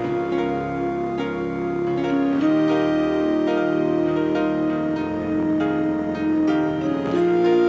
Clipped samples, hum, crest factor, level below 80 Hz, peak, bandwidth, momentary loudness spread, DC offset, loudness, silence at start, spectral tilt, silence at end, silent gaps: under 0.1%; none; 12 dB; -50 dBFS; -8 dBFS; 7.8 kHz; 6 LU; under 0.1%; -22 LUFS; 0 s; -8 dB/octave; 0 s; none